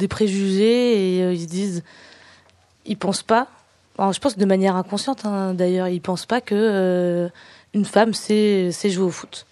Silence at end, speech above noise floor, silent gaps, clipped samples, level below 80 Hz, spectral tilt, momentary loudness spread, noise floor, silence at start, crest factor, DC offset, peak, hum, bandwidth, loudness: 0.1 s; 35 dB; none; under 0.1%; -60 dBFS; -5.5 dB/octave; 8 LU; -55 dBFS; 0 s; 20 dB; under 0.1%; 0 dBFS; none; 12 kHz; -20 LUFS